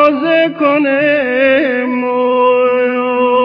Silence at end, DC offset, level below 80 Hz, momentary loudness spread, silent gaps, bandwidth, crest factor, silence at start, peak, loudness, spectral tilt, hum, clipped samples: 0 s; under 0.1%; -58 dBFS; 4 LU; none; 5.4 kHz; 12 dB; 0 s; 0 dBFS; -12 LUFS; -7 dB/octave; none; under 0.1%